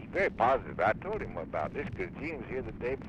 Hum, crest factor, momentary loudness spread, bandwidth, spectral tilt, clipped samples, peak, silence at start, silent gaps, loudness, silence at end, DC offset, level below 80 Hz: none; 18 dB; 10 LU; 9.2 kHz; -7.5 dB/octave; under 0.1%; -14 dBFS; 0 s; none; -33 LUFS; 0 s; under 0.1%; -50 dBFS